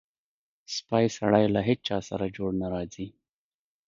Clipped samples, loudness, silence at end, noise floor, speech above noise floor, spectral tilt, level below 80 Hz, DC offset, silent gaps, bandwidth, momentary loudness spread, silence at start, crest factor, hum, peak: under 0.1%; -27 LUFS; 0.8 s; under -90 dBFS; over 63 dB; -6 dB/octave; -56 dBFS; under 0.1%; none; 7.6 kHz; 13 LU; 0.7 s; 22 dB; none; -6 dBFS